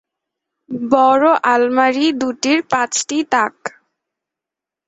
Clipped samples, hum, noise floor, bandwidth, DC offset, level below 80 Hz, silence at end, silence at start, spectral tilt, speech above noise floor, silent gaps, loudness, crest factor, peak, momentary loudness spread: under 0.1%; none; -86 dBFS; 8.2 kHz; under 0.1%; -62 dBFS; 1.2 s; 0.7 s; -2.5 dB/octave; 71 dB; none; -15 LUFS; 16 dB; -2 dBFS; 13 LU